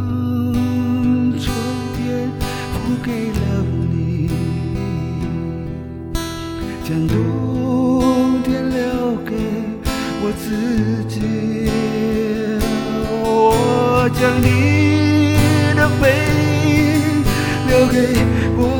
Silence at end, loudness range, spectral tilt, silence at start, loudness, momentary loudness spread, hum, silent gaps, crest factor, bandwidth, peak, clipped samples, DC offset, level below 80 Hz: 0 s; 7 LU; -6.5 dB/octave; 0 s; -17 LUFS; 9 LU; none; none; 16 dB; 19 kHz; 0 dBFS; under 0.1%; under 0.1%; -32 dBFS